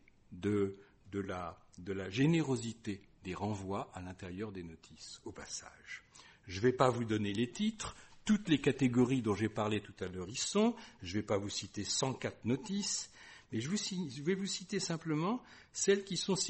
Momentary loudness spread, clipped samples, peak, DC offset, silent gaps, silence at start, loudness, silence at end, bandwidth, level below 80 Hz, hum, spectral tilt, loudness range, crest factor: 17 LU; under 0.1%; -12 dBFS; under 0.1%; none; 0.3 s; -36 LUFS; 0 s; 8.4 kHz; -66 dBFS; none; -4.5 dB/octave; 8 LU; 24 dB